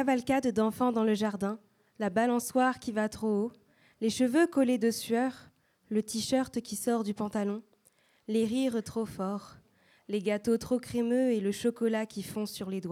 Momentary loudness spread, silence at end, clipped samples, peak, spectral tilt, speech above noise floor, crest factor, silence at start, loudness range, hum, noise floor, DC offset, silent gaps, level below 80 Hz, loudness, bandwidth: 9 LU; 0 s; under 0.1%; -14 dBFS; -5 dB/octave; 38 dB; 16 dB; 0 s; 4 LU; none; -67 dBFS; under 0.1%; none; -66 dBFS; -30 LUFS; 16 kHz